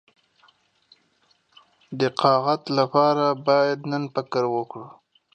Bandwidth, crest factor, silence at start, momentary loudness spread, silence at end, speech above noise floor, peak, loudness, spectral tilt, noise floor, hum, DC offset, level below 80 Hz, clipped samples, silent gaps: 9 kHz; 20 dB; 1.9 s; 10 LU; 0.45 s; 43 dB; -4 dBFS; -22 LUFS; -6.5 dB/octave; -65 dBFS; none; under 0.1%; -76 dBFS; under 0.1%; none